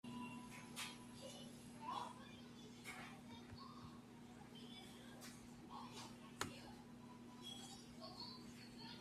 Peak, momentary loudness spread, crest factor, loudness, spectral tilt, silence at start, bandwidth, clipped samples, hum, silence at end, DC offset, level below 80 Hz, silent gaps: -28 dBFS; 9 LU; 28 dB; -55 LUFS; -3.5 dB/octave; 0.05 s; 14.5 kHz; under 0.1%; none; 0 s; under 0.1%; -76 dBFS; none